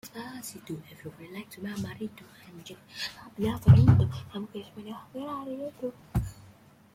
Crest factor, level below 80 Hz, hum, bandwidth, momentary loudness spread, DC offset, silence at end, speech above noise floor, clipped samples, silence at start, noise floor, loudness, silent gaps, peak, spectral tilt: 24 dB; -46 dBFS; none; 15.5 kHz; 24 LU; under 0.1%; 0.6 s; 27 dB; under 0.1%; 0.05 s; -56 dBFS; -28 LUFS; none; -6 dBFS; -7 dB/octave